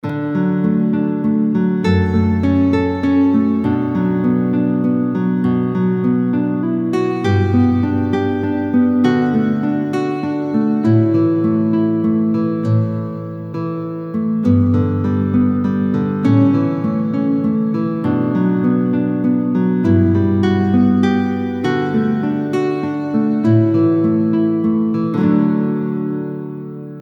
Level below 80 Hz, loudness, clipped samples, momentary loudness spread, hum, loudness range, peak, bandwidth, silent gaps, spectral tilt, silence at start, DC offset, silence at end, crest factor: -52 dBFS; -16 LUFS; under 0.1%; 6 LU; none; 2 LU; -2 dBFS; 7.2 kHz; none; -9.5 dB/octave; 0.05 s; under 0.1%; 0 s; 14 dB